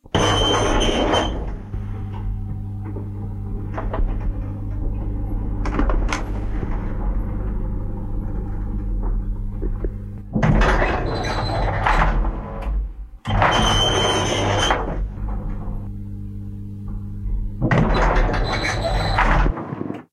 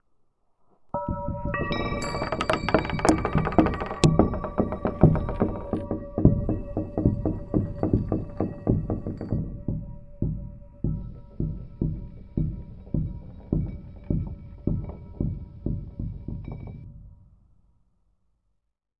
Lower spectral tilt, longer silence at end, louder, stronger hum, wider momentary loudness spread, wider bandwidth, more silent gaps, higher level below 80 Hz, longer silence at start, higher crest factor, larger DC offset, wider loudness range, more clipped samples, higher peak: second, -5 dB/octave vs -7 dB/octave; second, 0.1 s vs 1.85 s; first, -23 LUFS vs -28 LUFS; neither; about the same, 13 LU vs 15 LU; about the same, 10.5 kHz vs 11.5 kHz; neither; first, -24 dBFS vs -36 dBFS; second, 0.05 s vs 0.95 s; second, 18 dB vs 26 dB; neither; second, 8 LU vs 11 LU; neither; second, -4 dBFS vs 0 dBFS